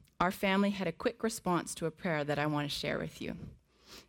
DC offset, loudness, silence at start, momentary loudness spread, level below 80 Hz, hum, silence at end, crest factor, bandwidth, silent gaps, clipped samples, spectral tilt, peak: under 0.1%; -34 LUFS; 0.2 s; 13 LU; -60 dBFS; none; 0.05 s; 20 dB; 17.5 kHz; none; under 0.1%; -5 dB/octave; -14 dBFS